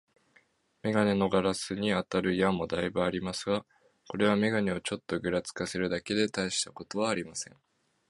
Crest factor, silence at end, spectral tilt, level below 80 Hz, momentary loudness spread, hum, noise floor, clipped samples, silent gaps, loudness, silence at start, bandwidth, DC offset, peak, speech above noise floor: 22 dB; 0.65 s; -4.5 dB/octave; -58 dBFS; 8 LU; none; -67 dBFS; under 0.1%; none; -30 LUFS; 0.85 s; 11.5 kHz; under 0.1%; -10 dBFS; 37 dB